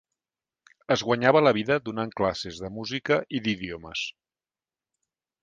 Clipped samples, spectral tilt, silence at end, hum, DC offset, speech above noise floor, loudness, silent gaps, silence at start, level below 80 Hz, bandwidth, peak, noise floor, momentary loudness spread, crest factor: under 0.1%; -5 dB/octave; 1.35 s; none; under 0.1%; over 65 dB; -26 LUFS; none; 0.9 s; -58 dBFS; 9 kHz; -4 dBFS; under -90 dBFS; 13 LU; 24 dB